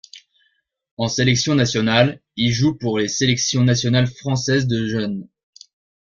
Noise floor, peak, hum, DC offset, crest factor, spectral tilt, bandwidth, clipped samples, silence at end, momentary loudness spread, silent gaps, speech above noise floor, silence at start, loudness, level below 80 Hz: -66 dBFS; -2 dBFS; none; under 0.1%; 18 dB; -4.5 dB/octave; 7.6 kHz; under 0.1%; 0.75 s; 7 LU; 0.91-0.97 s; 48 dB; 0.15 s; -19 LUFS; -50 dBFS